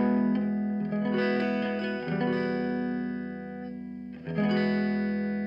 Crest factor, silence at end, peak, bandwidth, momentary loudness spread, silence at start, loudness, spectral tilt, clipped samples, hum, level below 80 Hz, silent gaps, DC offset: 12 dB; 0 s; -16 dBFS; 5.6 kHz; 12 LU; 0 s; -29 LUFS; -9 dB/octave; under 0.1%; none; -62 dBFS; none; under 0.1%